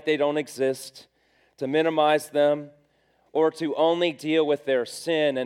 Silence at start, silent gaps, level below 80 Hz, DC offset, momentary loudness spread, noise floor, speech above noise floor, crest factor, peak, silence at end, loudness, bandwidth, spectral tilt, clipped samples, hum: 0.05 s; none; -78 dBFS; under 0.1%; 8 LU; -65 dBFS; 42 dB; 16 dB; -8 dBFS; 0 s; -24 LUFS; 15.5 kHz; -4.5 dB/octave; under 0.1%; none